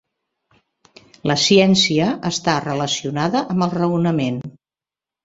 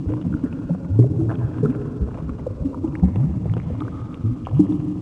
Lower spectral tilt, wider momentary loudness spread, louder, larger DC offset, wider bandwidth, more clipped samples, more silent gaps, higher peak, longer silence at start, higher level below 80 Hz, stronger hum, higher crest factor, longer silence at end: second, -4.5 dB/octave vs -11 dB/octave; about the same, 10 LU vs 10 LU; first, -18 LUFS vs -22 LUFS; neither; first, 7.8 kHz vs 3.6 kHz; neither; neither; about the same, -2 dBFS vs 0 dBFS; first, 1.25 s vs 0 s; second, -54 dBFS vs -34 dBFS; neither; about the same, 18 dB vs 20 dB; first, 0.75 s vs 0 s